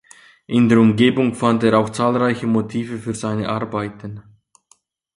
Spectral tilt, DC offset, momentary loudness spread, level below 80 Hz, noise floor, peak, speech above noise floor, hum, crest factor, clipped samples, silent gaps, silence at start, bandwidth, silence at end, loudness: -6.5 dB/octave; under 0.1%; 13 LU; -54 dBFS; -59 dBFS; 0 dBFS; 41 dB; none; 18 dB; under 0.1%; none; 0.5 s; 11 kHz; 0.95 s; -18 LUFS